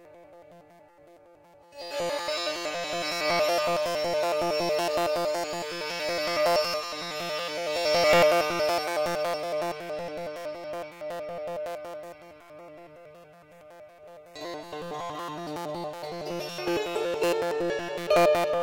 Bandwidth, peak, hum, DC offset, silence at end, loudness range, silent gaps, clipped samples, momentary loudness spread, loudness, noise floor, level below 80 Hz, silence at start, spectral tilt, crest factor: 17 kHz; -10 dBFS; none; under 0.1%; 0 s; 15 LU; none; under 0.1%; 16 LU; -28 LUFS; -55 dBFS; -64 dBFS; 0 s; -3.5 dB/octave; 18 dB